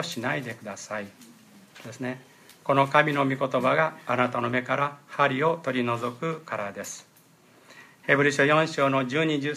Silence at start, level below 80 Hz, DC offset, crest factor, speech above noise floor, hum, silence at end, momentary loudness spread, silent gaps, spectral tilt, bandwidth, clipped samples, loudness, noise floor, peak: 0 s; -74 dBFS; under 0.1%; 22 dB; 32 dB; none; 0 s; 15 LU; none; -5 dB/octave; 15.5 kHz; under 0.1%; -25 LUFS; -57 dBFS; -6 dBFS